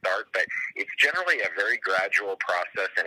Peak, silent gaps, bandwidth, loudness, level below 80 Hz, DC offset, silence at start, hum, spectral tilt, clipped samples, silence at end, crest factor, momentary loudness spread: -8 dBFS; none; 15 kHz; -25 LUFS; -80 dBFS; under 0.1%; 0.05 s; none; -1 dB/octave; under 0.1%; 0 s; 18 dB; 6 LU